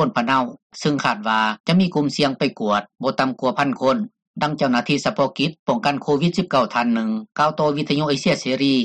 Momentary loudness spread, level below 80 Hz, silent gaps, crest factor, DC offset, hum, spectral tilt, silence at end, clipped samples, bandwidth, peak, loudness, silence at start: 4 LU; -60 dBFS; 0.62-0.70 s, 1.60-1.64 s, 4.27-4.34 s, 5.59-5.66 s; 14 dB; under 0.1%; none; -5.5 dB/octave; 0 s; under 0.1%; 10 kHz; -6 dBFS; -20 LUFS; 0 s